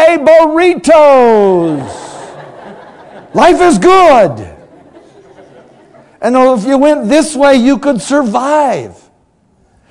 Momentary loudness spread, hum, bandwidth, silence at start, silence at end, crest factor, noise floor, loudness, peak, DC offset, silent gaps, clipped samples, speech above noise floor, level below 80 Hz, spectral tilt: 17 LU; none; 12 kHz; 0 s; 1 s; 10 dB; -52 dBFS; -8 LUFS; 0 dBFS; under 0.1%; none; 4%; 45 dB; -44 dBFS; -5 dB/octave